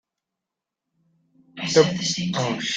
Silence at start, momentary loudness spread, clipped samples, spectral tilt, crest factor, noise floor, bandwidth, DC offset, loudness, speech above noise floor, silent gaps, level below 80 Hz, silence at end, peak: 1.55 s; 6 LU; under 0.1%; -4 dB/octave; 22 dB; -86 dBFS; 9.4 kHz; under 0.1%; -22 LUFS; 64 dB; none; -62 dBFS; 0 s; -4 dBFS